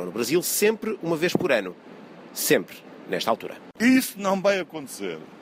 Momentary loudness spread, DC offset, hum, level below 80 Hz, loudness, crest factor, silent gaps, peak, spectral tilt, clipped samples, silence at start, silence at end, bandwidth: 17 LU; under 0.1%; none; -68 dBFS; -24 LUFS; 20 dB; none; -6 dBFS; -3.5 dB/octave; under 0.1%; 0 s; 0 s; 16 kHz